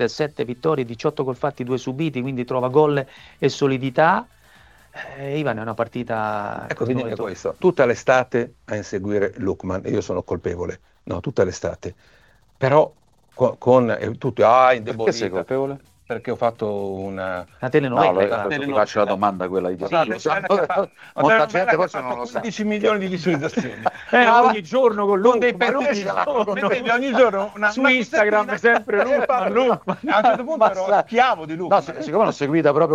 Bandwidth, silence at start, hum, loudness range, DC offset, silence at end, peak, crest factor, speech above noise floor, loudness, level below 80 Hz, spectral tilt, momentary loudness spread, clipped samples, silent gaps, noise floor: 9.4 kHz; 0 s; none; 6 LU; under 0.1%; 0 s; -2 dBFS; 18 dB; 31 dB; -20 LUFS; -56 dBFS; -6 dB/octave; 11 LU; under 0.1%; none; -51 dBFS